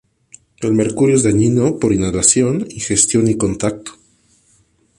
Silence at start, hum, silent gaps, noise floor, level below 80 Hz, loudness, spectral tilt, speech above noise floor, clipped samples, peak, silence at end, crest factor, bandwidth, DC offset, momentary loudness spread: 0.6 s; none; none; -56 dBFS; -42 dBFS; -15 LUFS; -5 dB/octave; 42 dB; under 0.1%; 0 dBFS; 1.05 s; 16 dB; 11.5 kHz; under 0.1%; 10 LU